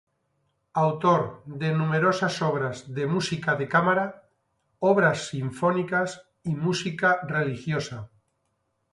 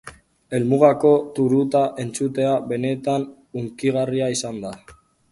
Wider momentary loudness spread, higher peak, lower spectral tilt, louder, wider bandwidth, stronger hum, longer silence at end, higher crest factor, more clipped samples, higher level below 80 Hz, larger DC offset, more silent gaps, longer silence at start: second, 10 LU vs 15 LU; second, -8 dBFS vs 0 dBFS; about the same, -6 dB/octave vs -6 dB/octave; second, -25 LUFS vs -20 LUFS; about the same, 11.5 kHz vs 11.5 kHz; neither; first, 0.85 s vs 0.4 s; about the same, 18 dB vs 20 dB; neither; second, -64 dBFS vs -58 dBFS; neither; neither; first, 0.75 s vs 0.05 s